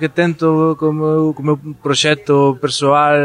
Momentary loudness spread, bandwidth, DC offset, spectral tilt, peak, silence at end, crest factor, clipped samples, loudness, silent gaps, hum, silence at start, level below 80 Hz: 5 LU; 11 kHz; under 0.1%; -5 dB/octave; -2 dBFS; 0 s; 12 dB; under 0.1%; -15 LUFS; none; none; 0 s; -58 dBFS